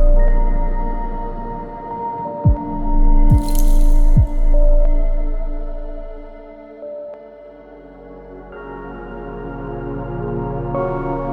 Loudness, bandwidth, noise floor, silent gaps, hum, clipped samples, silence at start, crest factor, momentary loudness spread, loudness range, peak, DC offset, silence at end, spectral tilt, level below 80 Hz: -22 LUFS; 13.5 kHz; -39 dBFS; none; none; under 0.1%; 0 s; 12 dB; 20 LU; 16 LU; -2 dBFS; under 0.1%; 0 s; -8 dB/octave; -16 dBFS